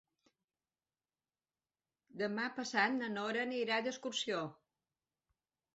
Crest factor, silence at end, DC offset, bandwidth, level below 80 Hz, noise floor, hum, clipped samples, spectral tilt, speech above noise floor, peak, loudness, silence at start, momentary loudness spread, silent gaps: 22 dB; 1.25 s; under 0.1%; 8 kHz; -86 dBFS; under -90 dBFS; none; under 0.1%; -1.5 dB/octave; over 53 dB; -18 dBFS; -37 LUFS; 2.15 s; 8 LU; none